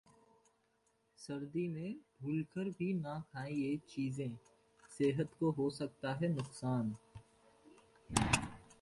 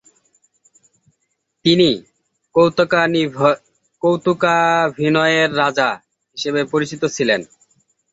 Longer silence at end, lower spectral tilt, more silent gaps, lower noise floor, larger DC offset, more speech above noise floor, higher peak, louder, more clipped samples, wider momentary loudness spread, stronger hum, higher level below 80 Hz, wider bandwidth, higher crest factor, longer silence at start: second, 0.1 s vs 0.7 s; about the same, -5.5 dB/octave vs -5 dB/octave; neither; first, -77 dBFS vs -71 dBFS; neither; second, 39 dB vs 55 dB; second, -14 dBFS vs -2 dBFS; second, -39 LUFS vs -17 LUFS; neither; first, 12 LU vs 8 LU; neither; about the same, -62 dBFS vs -58 dBFS; first, 11.5 kHz vs 8 kHz; first, 26 dB vs 16 dB; second, 1.2 s vs 1.65 s